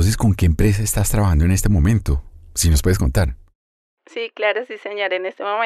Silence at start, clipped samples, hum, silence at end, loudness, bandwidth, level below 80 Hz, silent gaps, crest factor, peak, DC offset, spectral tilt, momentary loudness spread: 0 s; under 0.1%; none; 0 s; -19 LUFS; 14 kHz; -26 dBFS; 3.55-3.97 s; 12 dB; -6 dBFS; under 0.1%; -5.5 dB/octave; 9 LU